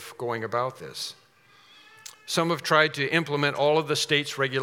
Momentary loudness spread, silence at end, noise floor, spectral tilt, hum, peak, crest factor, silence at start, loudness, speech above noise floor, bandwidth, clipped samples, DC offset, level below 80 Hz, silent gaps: 14 LU; 0 s; -57 dBFS; -4 dB/octave; none; -4 dBFS; 22 dB; 0 s; -25 LUFS; 32 dB; 18 kHz; under 0.1%; under 0.1%; -78 dBFS; none